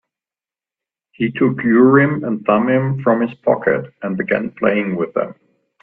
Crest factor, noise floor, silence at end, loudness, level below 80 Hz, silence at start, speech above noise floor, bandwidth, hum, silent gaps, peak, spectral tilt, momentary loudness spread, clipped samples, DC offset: 18 dB; under -90 dBFS; 0.5 s; -17 LUFS; -58 dBFS; 1.2 s; over 74 dB; 3.9 kHz; none; none; 0 dBFS; -11.5 dB/octave; 11 LU; under 0.1%; under 0.1%